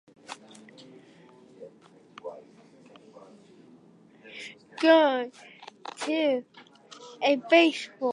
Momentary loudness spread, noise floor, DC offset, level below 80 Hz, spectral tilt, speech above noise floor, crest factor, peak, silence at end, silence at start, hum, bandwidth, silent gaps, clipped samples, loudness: 25 LU; -56 dBFS; under 0.1%; -86 dBFS; -3 dB/octave; 33 dB; 22 dB; -8 dBFS; 0 s; 0.3 s; none; 11 kHz; none; under 0.1%; -24 LUFS